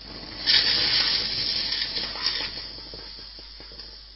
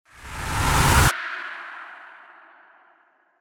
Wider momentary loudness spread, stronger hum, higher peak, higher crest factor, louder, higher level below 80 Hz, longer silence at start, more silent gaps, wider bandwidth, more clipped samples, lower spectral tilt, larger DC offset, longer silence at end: about the same, 21 LU vs 22 LU; neither; about the same, -6 dBFS vs -4 dBFS; about the same, 22 dB vs 22 dB; about the same, -22 LUFS vs -21 LUFS; second, -48 dBFS vs -32 dBFS; second, 0 s vs 0.2 s; neither; second, 6 kHz vs over 20 kHz; neither; about the same, -4 dB/octave vs -3.5 dB/octave; neither; second, 0 s vs 1.3 s